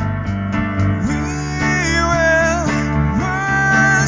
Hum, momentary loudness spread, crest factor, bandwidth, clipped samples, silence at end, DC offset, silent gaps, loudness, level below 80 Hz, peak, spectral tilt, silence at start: none; 7 LU; 14 dB; 7.6 kHz; under 0.1%; 0 s; under 0.1%; none; -16 LUFS; -28 dBFS; -2 dBFS; -5.5 dB/octave; 0 s